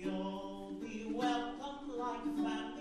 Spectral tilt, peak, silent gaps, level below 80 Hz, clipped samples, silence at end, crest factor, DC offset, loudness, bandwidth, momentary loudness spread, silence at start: -5.5 dB/octave; -24 dBFS; none; -62 dBFS; under 0.1%; 0 s; 16 dB; under 0.1%; -40 LUFS; 12 kHz; 9 LU; 0 s